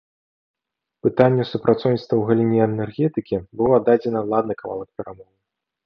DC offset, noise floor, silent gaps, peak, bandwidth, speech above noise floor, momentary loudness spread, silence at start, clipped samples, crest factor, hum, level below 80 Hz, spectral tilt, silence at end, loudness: under 0.1%; -56 dBFS; none; -2 dBFS; 6 kHz; 37 dB; 13 LU; 1.05 s; under 0.1%; 20 dB; none; -56 dBFS; -10 dB/octave; 0.65 s; -20 LUFS